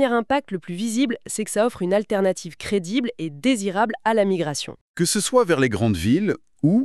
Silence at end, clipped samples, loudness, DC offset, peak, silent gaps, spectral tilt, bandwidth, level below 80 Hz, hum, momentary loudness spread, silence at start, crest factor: 0 s; under 0.1%; -22 LUFS; under 0.1%; -4 dBFS; 4.81-4.94 s; -5 dB/octave; 13.5 kHz; -52 dBFS; none; 8 LU; 0 s; 16 dB